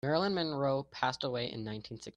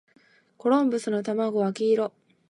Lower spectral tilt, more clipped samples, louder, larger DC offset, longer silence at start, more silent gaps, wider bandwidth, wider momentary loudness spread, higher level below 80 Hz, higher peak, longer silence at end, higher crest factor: about the same, -6 dB/octave vs -6.5 dB/octave; neither; second, -34 LUFS vs -25 LUFS; neither; second, 0.05 s vs 0.65 s; neither; about the same, 10.5 kHz vs 11.5 kHz; first, 10 LU vs 6 LU; first, -66 dBFS vs -80 dBFS; second, -14 dBFS vs -10 dBFS; second, 0.05 s vs 0.4 s; about the same, 20 dB vs 16 dB